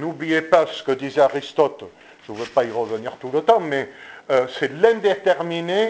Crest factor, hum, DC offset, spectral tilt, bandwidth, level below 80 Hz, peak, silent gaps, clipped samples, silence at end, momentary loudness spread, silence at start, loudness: 20 dB; none; under 0.1%; -5.5 dB/octave; 8 kHz; -64 dBFS; 0 dBFS; none; under 0.1%; 0 s; 11 LU; 0 s; -20 LUFS